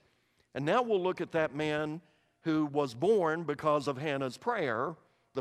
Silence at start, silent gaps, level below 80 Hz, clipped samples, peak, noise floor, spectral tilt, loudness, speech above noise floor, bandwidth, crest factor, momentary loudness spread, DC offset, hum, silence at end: 0.55 s; none; -72 dBFS; under 0.1%; -16 dBFS; -71 dBFS; -6.5 dB/octave; -32 LUFS; 40 dB; 12.5 kHz; 18 dB; 11 LU; under 0.1%; none; 0 s